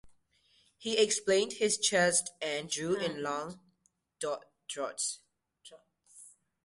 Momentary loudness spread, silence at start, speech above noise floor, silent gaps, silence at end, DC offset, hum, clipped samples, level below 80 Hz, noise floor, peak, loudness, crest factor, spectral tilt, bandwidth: 14 LU; 0.05 s; 44 dB; none; 0.4 s; under 0.1%; none; under 0.1%; -72 dBFS; -75 dBFS; -14 dBFS; -31 LUFS; 20 dB; -2 dB/octave; 11.5 kHz